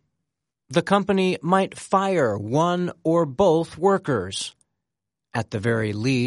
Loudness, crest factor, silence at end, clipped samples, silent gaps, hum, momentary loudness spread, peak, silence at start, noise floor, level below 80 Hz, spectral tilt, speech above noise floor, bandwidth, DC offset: -22 LUFS; 18 dB; 0 s; under 0.1%; none; none; 9 LU; -4 dBFS; 0.7 s; -85 dBFS; -58 dBFS; -6 dB/octave; 64 dB; 11.5 kHz; under 0.1%